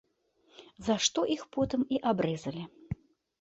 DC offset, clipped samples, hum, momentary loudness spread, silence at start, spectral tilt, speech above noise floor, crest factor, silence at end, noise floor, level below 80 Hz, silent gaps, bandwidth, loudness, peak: under 0.1%; under 0.1%; none; 15 LU; 0.6 s; -4 dB/octave; 38 dB; 20 dB; 0.45 s; -69 dBFS; -60 dBFS; none; 8.2 kHz; -31 LUFS; -12 dBFS